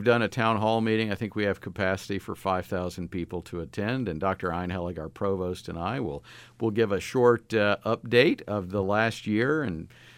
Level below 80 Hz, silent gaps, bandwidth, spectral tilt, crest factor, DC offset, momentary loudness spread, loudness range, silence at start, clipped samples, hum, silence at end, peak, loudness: -54 dBFS; none; 16 kHz; -6.5 dB/octave; 20 dB; under 0.1%; 11 LU; 6 LU; 0 s; under 0.1%; none; 0.05 s; -6 dBFS; -27 LUFS